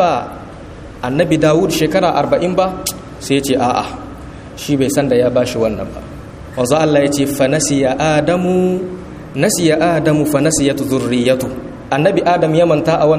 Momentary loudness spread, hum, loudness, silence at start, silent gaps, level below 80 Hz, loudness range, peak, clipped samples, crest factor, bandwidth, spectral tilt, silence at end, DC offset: 16 LU; none; -14 LUFS; 0 s; none; -40 dBFS; 3 LU; 0 dBFS; under 0.1%; 14 dB; 15.5 kHz; -5 dB/octave; 0 s; under 0.1%